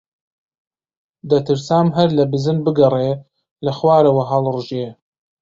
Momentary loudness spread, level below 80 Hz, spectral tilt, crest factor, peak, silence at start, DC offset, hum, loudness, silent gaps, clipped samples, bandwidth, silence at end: 12 LU; -56 dBFS; -8 dB/octave; 16 dB; -2 dBFS; 1.25 s; under 0.1%; none; -17 LUFS; 3.51-3.56 s; under 0.1%; 7.8 kHz; 0.5 s